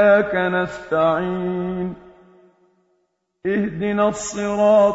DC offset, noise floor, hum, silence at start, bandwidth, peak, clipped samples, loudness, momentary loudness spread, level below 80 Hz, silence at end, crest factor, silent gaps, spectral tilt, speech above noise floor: under 0.1%; -70 dBFS; none; 0 s; 8 kHz; -4 dBFS; under 0.1%; -20 LUFS; 11 LU; -52 dBFS; 0 s; 16 dB; none; -5.5 dB/octave; 51 dB